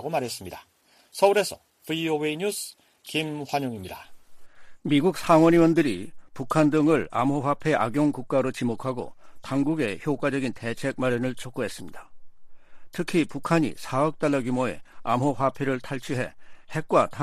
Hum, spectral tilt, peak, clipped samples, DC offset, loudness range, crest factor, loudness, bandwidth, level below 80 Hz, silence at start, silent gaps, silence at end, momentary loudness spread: none; -6 dB/octave; -6 dBFS; under 0.1%; under 0.1%; 7 LU; 20 dB; -25 LUFS; 15 kHz; -56 dBFS; 0 s; none; 0 s; 17 LU